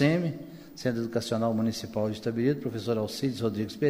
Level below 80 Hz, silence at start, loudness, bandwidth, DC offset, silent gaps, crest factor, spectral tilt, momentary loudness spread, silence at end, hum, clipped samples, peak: -62 dBFS; 0 s; -30 LUFS; 15.5 kHz; under 0.1%; none; 18 dB; -6.5 dB/octave; 5 LU; 0 s; none; under 0.1%; -12 dBFS